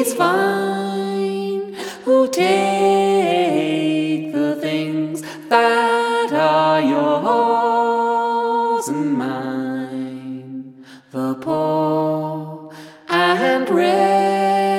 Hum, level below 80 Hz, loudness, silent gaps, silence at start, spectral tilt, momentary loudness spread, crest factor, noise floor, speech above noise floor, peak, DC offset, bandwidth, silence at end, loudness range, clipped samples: none; -72 dBFS; -18 LUFS; none; 0 s; -5 dB/octave; 13 LU; 18 dB; -41 dBFS; 25 dB; 0 dBFS; under 0.1%; 16.5 kHz; 0 s; 6 LU; under 0.1%